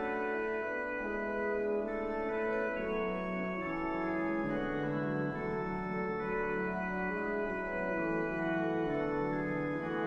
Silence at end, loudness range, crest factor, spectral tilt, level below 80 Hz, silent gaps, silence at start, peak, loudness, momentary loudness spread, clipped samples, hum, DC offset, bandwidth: 0 s; 1 LU; 12 dB; -8.5 dB/octave; -54 dBFS; none; 0 s; -22 dBFS; -35 LUFS; 2 LU; under 0.1%; none; under 0.1%; 7.4 kHz